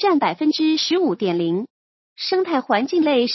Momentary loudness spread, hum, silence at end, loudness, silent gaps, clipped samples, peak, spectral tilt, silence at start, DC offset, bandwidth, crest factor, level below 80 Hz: 7 LU; none; 0 s; -20 LUFS; 1.70-2.16 s; under 0.1%; -4 dBFS; -5 dB/octave; 0 s; under 0.1%; 6.2 kHz; 16 dB; -74 dBFS